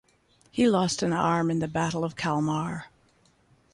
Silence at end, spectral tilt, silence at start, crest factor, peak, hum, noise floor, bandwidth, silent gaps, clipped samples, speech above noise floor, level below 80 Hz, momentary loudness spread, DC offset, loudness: 0.85 s; -5.5 dB/octave; 0.55 s; 16 dB; -12 dBFS; none; -63 dBFS; 11.5 kHz; none; under 0.1%; 38 dB; -58 dBFS; 10 LU; under 0.1%; -26 LUFS